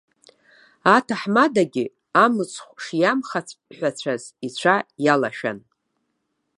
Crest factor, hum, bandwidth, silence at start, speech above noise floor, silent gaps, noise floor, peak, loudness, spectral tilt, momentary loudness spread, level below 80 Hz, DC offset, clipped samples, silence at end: 22 dB; none; 11.5 kHz; 0.85 s; 53 dB; none; -74 dBFS; 0 dBFS; -21 LUFS; -5 dB/octave; 12 LU; -72 dBFS; under 0.1%; under 0.1%; 1 s